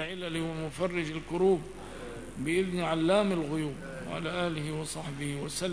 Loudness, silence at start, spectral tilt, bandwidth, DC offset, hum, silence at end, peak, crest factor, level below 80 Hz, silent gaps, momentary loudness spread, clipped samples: -31 LUFS; 0 s; -5.5 dB/octave; 11 kHz; 0.3%; none; 0 s; -14 dBFS; 18 dB; -54 dBFS; none; 13 LU; under 0.1%